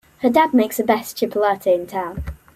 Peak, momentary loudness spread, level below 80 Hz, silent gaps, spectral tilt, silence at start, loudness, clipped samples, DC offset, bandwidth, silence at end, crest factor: -2 dBFS; 11 LU; -42 dBFS; none; -5 dB/octave; 0.2 s; -19 LUFS; under 0.1%; under 0.1%; 16 kHz; 0.2 s; 16 dB